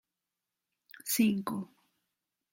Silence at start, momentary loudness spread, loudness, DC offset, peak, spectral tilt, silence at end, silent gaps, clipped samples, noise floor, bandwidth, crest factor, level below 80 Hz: 1.05 s; 16 LU; -31 LUFS; under 0.1%; -16 dBFS; -4 dB/octave; 0.9 s; none; under 0.1%; -89 dBFS; 16.5 kHz; 20 dB; -76 dBFS